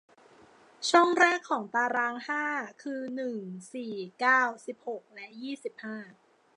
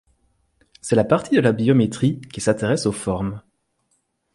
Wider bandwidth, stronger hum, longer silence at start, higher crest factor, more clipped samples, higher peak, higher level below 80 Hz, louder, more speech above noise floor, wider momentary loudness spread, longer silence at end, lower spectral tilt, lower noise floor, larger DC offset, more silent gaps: about the same, 11 kHz vs 11.5 kHz; neither; about the same, 0.8 s vs 0.85 s; about the same, 22 dB vs 18 dB; neither; second, -8 dBFS vs -2 dBFS; second, -86 dBFS vs -50 dBFS; second, -28 LUFS vs -20 LUFS; second, 28 dB vs 50 dB; first, 18 LU vs 10 LU; second, 0.45 s vs 0.95 s; second, -3 dB/octave vs -6 dB/octave; second, -58 dBFS vs -69 dBFS; neither; neither